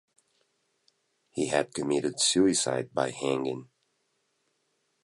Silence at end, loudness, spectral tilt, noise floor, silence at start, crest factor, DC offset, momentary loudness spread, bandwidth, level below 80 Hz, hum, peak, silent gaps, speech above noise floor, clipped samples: 1.4 s; -27 LUFS; -3 dB/octave; -76 dBFS; 1.35 s; 22 dB; under 0.1%; 11 LU; 11.5 kHz; -68 dBFS; none; -8 dBFS; none; 48 dB; under 0.1%